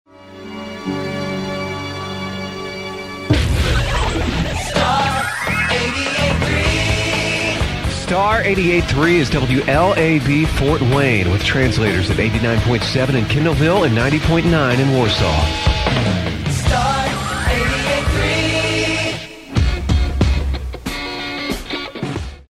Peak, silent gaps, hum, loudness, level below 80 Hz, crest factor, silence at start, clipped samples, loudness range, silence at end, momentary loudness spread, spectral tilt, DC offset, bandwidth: 0 dBFS; none; none; -17 LUFS; -26 dBFS; 16 dB; 0.2 s; under 0.1%; 6 LU; 0.1 s; 10 LU; -5.5 dB/octave; under 0.1%; 15.5 kHz